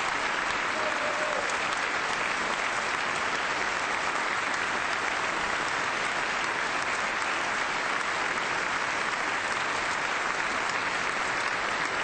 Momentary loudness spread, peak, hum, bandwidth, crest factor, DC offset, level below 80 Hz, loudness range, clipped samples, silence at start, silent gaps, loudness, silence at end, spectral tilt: 0 LU; -14 dBFS; none; 9.4 kHz; 14 dB; under 0.1%; -58 dBFS; 0 LU; under 0.1%; 0 s; none; -28 LUFS; 0 s; -1.5 dB/octave